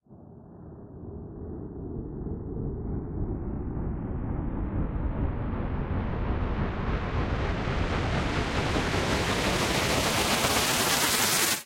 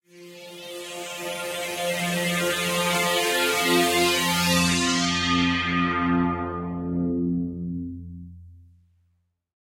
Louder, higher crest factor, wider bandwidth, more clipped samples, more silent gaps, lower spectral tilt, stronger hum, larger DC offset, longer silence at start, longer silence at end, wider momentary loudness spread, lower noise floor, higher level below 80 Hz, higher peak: second, -28 LUFS vs -23 LUFS; about the same, 18 dB vs 18 dB; about the same, 16.5 kHz vs 16.5 kHz; neither; neither; about the same, -3.5 dB/octave vs -3.5 dB/octave; neither; neither; about the same, 0.1 s vs 0.15 s; second, 0 s vs 1.15 s; about the same, 16 LU vs 16 LU; second, -49 dBFS vs -70 dBFS; first, -36 dBFS vs -56 dBFS; about the same, -10 dBFS vs -8 dBFS